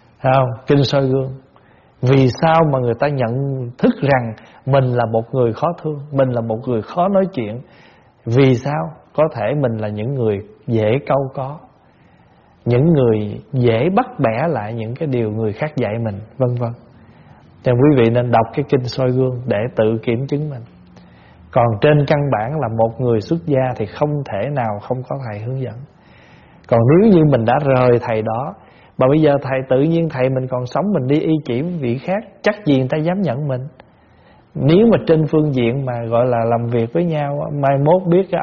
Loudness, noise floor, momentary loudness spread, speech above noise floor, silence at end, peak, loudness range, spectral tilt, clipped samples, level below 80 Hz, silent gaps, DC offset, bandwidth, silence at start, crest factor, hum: -17 LUFS; -50 dBFS; 11 LU; 34 dB; 0 s; 0 dBFS; 4 LU; -7 dB/octave; under 0.1%; -48 dBFS; none; under 0.1%; 6.8 kHz; 0.25 s; 16 dB; none